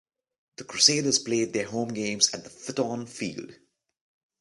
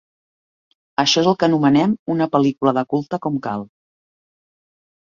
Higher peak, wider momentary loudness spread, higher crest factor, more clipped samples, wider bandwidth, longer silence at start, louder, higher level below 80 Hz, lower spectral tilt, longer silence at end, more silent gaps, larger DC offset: about the same, -4 dBFS vs -2 dBFS; first, 17 LU vs 10 LU; first, 24 dB vs 18 dB; neither; first, 11.5 kHz vs 7.4 kHz; second, 0.6 s vs 1 s; second, -25 LUFS vs -18 LUFS; second, -70 dBFS vs -60 dBFS; second, -2 dB/octave vs -5 dB/octave; second, 0.85 s vs 1.4 s; second, none vs 1.99-2.06 s; neither